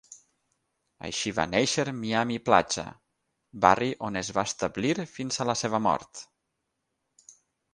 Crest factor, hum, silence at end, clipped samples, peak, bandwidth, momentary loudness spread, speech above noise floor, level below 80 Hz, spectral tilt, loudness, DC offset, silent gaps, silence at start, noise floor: 26 dB; none; 0.45 s; under 0.1%; -2 dBFS; 11.5 kHz; 10 LU; 54 dB; -58 dBFS; -3.5 dB/octave; -27 LUFS; under 0.1%; none; 0.1 s; -80 dBFS